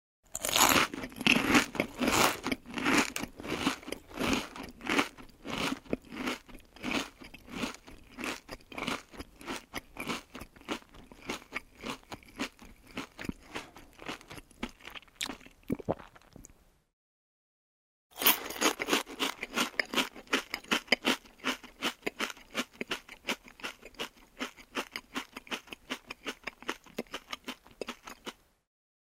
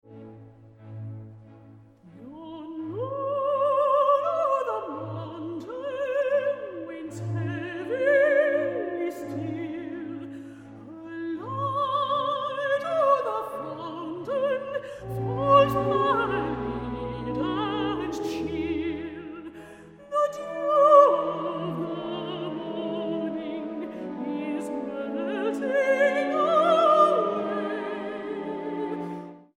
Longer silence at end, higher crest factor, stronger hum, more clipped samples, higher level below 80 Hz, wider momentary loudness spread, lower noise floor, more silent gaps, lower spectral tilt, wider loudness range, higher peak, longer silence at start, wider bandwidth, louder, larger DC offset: first, 0.85 s vs 0.15 s; first, 30 dB vs 22 dB; neither; neither; about the same, -58 dBFS vs -56 dBFS; about the same, 18 LU vs 17 LU; first, -59 dBFS vs -51 dBFS; first, 16.93-18.10 s vs none; second, -2 dB/octave vs -6.5 dB/octave; first, 13 LU vs 8 LU; about the same, -6 dBFS vs -6 dBFS; first, 0.35 s vs 0.05 s; first, 16 kHz vs 14 kHz; second, -33 LUFS vs -26 LUFS; neither